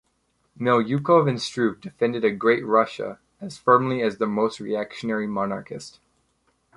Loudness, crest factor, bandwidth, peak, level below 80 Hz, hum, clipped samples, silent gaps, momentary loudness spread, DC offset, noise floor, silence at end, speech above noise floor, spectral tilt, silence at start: -23 LUFS; 20 dB; 11.5 kHz; -4 dBFS; -64 dBFS; none; under 0.1%; none; 15 LU; under 0.1%; -69 dBFS; 0.85 s; 47 dB; -6.5 dB/octave; 0.6 s